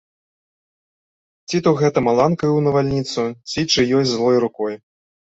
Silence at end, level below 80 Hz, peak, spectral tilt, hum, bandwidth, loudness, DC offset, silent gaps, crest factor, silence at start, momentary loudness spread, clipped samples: 0.55 s; -52 dBFS; -2 dBFS; -5.5 dB/octave; none; 8 kHz; -18 LUFS; under 0.1%; none; 16 dB; 1.5 s; 8 LU; under 0.1%